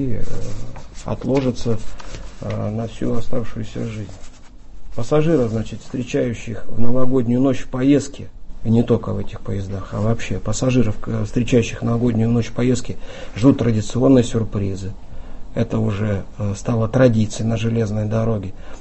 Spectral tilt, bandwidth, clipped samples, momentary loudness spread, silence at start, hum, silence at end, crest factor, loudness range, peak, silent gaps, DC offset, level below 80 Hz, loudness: -7 dB/octave; 8.4 kHz; under 0.1%; 17 LU; 0 s; none; 0 s; 16 dB; 6 LU; 0 dBFS; none; under 0.1%; -36 dBFS; -20 LUFS